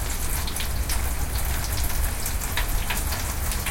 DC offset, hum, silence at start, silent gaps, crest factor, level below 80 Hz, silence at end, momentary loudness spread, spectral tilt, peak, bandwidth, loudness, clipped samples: under 0.1%; none; 0 s; none; 16 dB; -28 dBFS; 0 s; 1 LU; -3 dB/octave; -10 dBFS; 17 kHz; -27 LUFS; under 0.1%